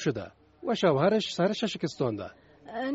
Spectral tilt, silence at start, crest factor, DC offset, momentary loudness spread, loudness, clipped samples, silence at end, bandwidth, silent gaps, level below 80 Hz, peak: -4.5 dB/octave; 0 s; 18 dB; under 0.1%; 16 LU; -28 LUFS; under 0.1%; 0 s; 8 kHz; none; -64 dBFS; -10 dBFS